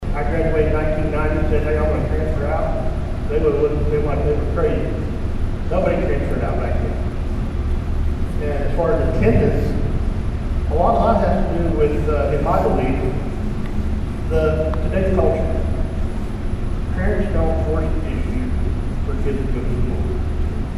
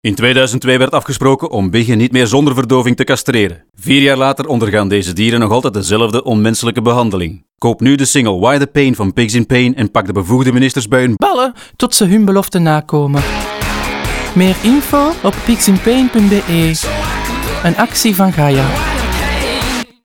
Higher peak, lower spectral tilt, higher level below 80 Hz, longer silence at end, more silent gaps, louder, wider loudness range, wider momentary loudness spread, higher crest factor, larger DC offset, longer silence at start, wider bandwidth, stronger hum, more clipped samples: about the same, -2 dBFS vs 0 dBFS; first, -8.5 dB/octave vs -5 dB/octave; first, -22 dBFS vs -30 dBFS; second, 0 s vs 0.2 s; neither; second, -21 LUFS vs -12 LUFS; first, 4 LU vs 1 LU; about the same, 7 LU vs 7 LU; about the same, 16 dB vs 12 dB; neither; about the same, 0 s vs 0.05 s; second, 11 kHz vs 19 kHz; neither; neither